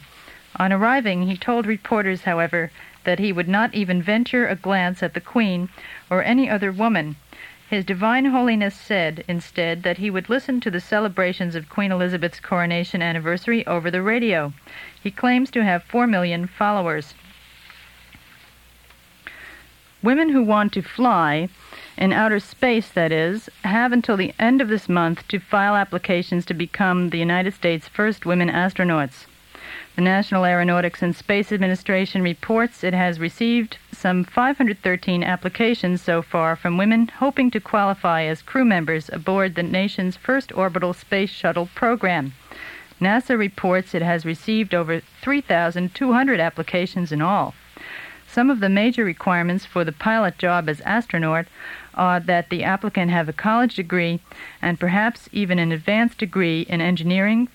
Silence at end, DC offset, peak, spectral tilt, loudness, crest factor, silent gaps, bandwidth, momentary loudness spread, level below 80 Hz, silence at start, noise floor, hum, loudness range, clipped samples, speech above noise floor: 0.05 s; under 0.1%; -4 dBFS; -7 dB/octave; -21 LUFS; 18 dB; none; 16 kHz; 8 LU; -56 dBFS; 0.25 s; -51 dBFS; none; 2 LU; under 0.1%; 30 dB